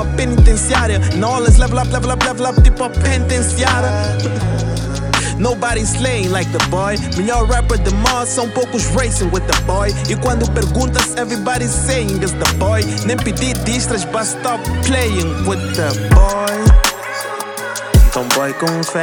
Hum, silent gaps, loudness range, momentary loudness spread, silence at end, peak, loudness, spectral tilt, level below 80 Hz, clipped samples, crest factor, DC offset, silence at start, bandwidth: none; none; 2 LU; 6 LU; 0 s; 0 dBFS; -15 LUFS; -4.5 dB/octave; -18 dBFS; under 0.1%; 14 dB; under 0.1%; 0 s; 19.5 kHz